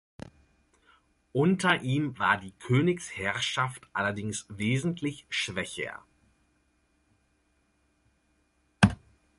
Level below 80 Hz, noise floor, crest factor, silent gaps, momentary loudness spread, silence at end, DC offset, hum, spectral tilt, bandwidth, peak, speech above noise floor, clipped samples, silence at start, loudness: -54 dBFS; -71 dBFS; 26 dB; none; 12 LU; 0.4 s; under 0.1%; none; -5 dB/octave; 11.5 kHz; -6 dBFS; 42 dB; under 0.1%; 0.25 s; -29 LUFS